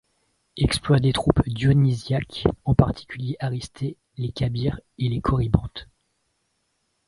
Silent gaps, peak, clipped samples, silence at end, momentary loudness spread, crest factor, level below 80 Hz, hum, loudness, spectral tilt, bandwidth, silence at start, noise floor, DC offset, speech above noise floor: none; 0 dBFS; under 0.1%; 1.25 s; 12 LU; 24 dB; -38 dBFS; none; -23 LUFS; -7 dB/octave; 11.5 kHz; 0.55 s; -72 dBFS; under 0.1%; 50 dB